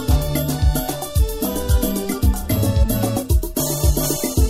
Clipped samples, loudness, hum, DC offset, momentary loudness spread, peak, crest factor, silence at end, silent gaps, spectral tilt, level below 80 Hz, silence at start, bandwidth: under 0.1%; -20 LUFS; none; under 0.1%; 3 LU; -4 dBFS; 14 dB; 0 s; none; -5.5 dB/octave; -22 dBFS; 0 s; 16.5 kHz